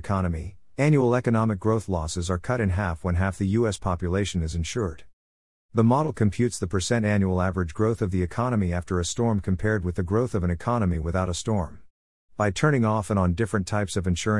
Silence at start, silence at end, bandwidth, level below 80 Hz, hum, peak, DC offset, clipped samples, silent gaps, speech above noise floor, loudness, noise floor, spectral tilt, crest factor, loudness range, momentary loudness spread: 0.05 s; 0 s; 12 kHz; -44 dBFS; none; -8 dBFS; 0.4%; under 0.1%; 5.13-5.69 s, 11.90-12.28 s; over 66 dB; -25 LUFS; under -90 dBFS; -6.5 dB/octave; 18 dB; 2 LU; 6 LU